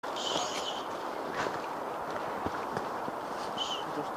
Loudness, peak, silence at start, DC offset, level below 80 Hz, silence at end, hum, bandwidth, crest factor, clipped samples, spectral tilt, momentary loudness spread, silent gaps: -35 LUFS; -16 dBFS; 0.05 s; under 0.1%; -64 dBFS; 0 s; none; 15.5 kHz; 20 dB; under 0.1%; -3 dB/octave; 5 LU; none